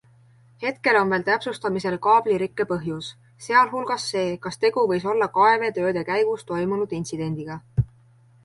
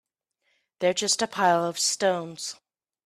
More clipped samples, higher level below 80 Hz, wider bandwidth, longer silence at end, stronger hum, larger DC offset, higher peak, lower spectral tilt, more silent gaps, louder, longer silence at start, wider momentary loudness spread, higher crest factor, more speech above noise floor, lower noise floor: neither; first, -50 dBFS vs -74 dBFS; second, 11.5 kHz vs 15.5 kHz; about the same, 0.6 s vs 0.55 s; neither; neither; first, -4 dBFS vs -8 dBFS; first, -5.5 dB/octave vs -2 dB/octave; neither; about the same, -23 LUFS vs -25 LUFS; second, 0.6 s vs 0.8 s; about the same, 11 LU vs 12 LU; about the same, 18 dB vs 20 dB; second, 32 dB vs 50 dB; second, -55 dBFS vs -75 dBFS